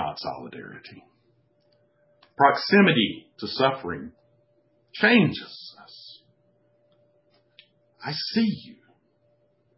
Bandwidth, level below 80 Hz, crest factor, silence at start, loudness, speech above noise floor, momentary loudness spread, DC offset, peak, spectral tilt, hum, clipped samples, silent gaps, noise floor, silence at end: 5.8 kHz; -62 dBFS; 22 dB; 0 s; -23 LUFS; 42 dB; 26 LU; under 0.1%; -4 dBFS; -9 dB/octave; none; under 0.1%; none; -66 dBFS; 1.05 s